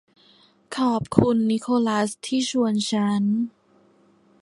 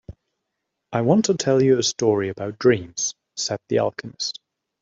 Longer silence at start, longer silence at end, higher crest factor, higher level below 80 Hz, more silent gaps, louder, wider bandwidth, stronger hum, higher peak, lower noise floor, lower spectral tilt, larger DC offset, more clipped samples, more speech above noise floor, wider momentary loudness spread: first, 0.7 s vs 0.1 s; first, 0.95 s vs 0.5 s; first, 24 dB vs 18 dB; about the same, -54 dBFS vs -58 dBFS; neither; about the same, -23 LUFS vs -22 LUFS; first, 11.5 kHz vs 7.8 kHz; neither; first, 0 dBFS vs -4 dBFS; second, -58 dBFS vs -79 dBFS; about the same, -5.5 dB/octave vs -4.5 dB/octave; neither; neither; second, 37 dB vs 59 dB; second, 5 LU vs 10 LU